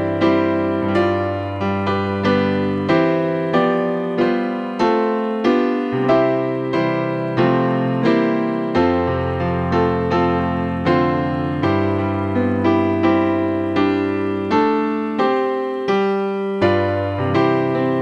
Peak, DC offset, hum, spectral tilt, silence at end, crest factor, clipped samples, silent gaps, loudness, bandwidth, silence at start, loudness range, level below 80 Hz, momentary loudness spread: -4 dBFS; under 0.1%; none; -8 dB/octave; 0 s; 14 dB; under 0.1%; none; -18 LUFS; 7.2 kHz; 0 s; 1 LU; -46 dBFS; 4 LU